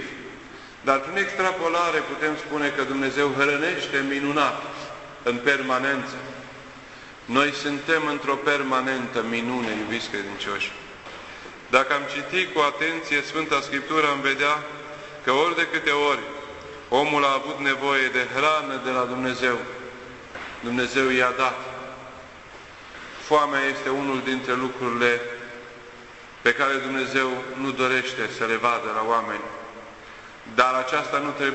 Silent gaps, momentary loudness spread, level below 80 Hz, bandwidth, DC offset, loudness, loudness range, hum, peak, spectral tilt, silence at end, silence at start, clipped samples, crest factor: none; 19 LU; -60 dBFS; 8.4 kHz; under 0.1%; -23 LUFS; 3 LU; none; -2 dBFS; -3.5 dB/octave; 0 s; 0 s; under 0.1%; 22 dB